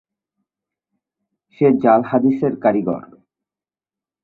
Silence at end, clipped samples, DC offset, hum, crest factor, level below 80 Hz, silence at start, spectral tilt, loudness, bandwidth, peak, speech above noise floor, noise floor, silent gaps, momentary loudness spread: 1.25 s; under 0.1%; under 0.1%; none; 20 dB; -62 dBFS; 1.6 s; -11 dB/octave; -17 LUFS; 4.2 kHz; 0 dBFS; over 74 dB; under -90 dBFS; none; 9 LU